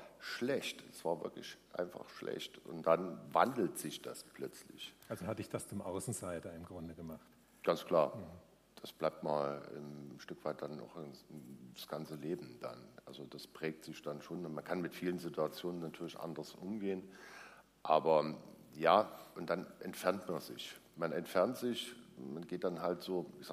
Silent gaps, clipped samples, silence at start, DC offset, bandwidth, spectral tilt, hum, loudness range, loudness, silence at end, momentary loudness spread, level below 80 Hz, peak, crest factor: none; under 0.1%; 0 s; under 0.1%; 15.5 kHz; -5 dB/octave; none; 10 LU; -39 LUFS; 0 s; 17 LU; -76 dBFS; -14 dBFS; 26 dB